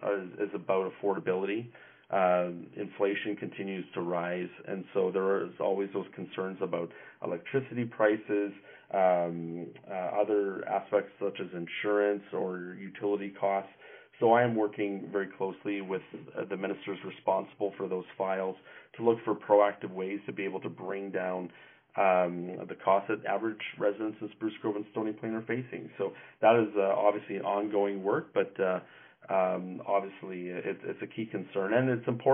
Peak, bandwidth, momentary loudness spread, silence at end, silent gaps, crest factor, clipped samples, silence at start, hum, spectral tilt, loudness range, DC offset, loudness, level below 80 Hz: -10 dBFS; 3.7 kHz; 12 LU; 0 s; none; 22 dB; under 0.1%; 0 s; none; -2.5 dB/octave; 4 LU; under 0.1%; -32 LUFS; -82 dBFS